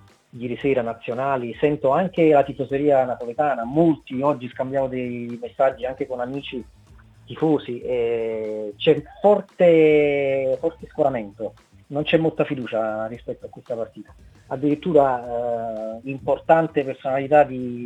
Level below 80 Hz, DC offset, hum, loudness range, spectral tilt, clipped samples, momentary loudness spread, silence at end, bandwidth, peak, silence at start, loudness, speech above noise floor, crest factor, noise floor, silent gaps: -54 dBFS; under 0.1%; none; 6 LU; -8 dB/octave; under 0.1%; 13 LU; 0 s; 8.8 kHz; -2 dBFS; 0.35 s; -22 LUFS; 27 dB; 20 dB; -49 dBFS; none